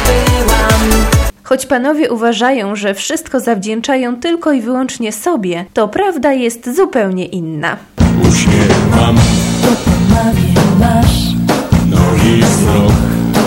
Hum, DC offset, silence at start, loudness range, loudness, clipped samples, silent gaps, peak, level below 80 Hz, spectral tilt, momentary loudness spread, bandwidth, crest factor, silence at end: none; under 0.1%; 0 s; 5 LU; -12 LUFS; 0.1%; none; 0 dBFS; -22 dBFS; -5.5 dB/octave; 7 LU; 17 kHz; 10 dB; 0 s